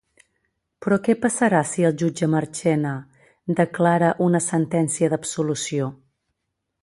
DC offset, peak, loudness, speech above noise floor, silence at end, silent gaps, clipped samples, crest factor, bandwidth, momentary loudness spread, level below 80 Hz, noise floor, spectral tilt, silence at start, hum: under 0.1%; -4 dBFS; -21 LUFS; 57 dB; 0.9 s; none; under 0.1%; 18 dB; 11.5 kHz; 8 LU; -62 dBFS; -78 dBFS; -5.5 dB/octave; 0.8 s; none